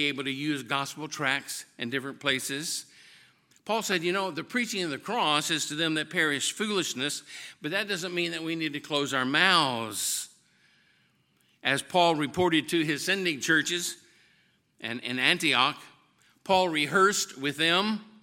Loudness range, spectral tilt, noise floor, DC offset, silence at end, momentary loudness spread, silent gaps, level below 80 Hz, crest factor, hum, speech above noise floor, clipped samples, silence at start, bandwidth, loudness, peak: 4 LU; -2.5 dB/octave; -68 dBFS; under 0.1%; 0.15 s; 11 LU; none; -72 dBFS; 24 dB; none; 40 dB; under 0.1%; 0 s; 17 kHz; -27 LUFS; -6 dBFS